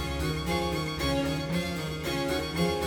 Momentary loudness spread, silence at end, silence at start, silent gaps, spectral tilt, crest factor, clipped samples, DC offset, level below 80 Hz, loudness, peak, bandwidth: 3 LU; 0 s; 0 s; none; -5 dB/octave; 14 dB; under 0.1%; under 0.1%; -40 dBFS; -30 LUFS; -16 dBFS; 19 kHz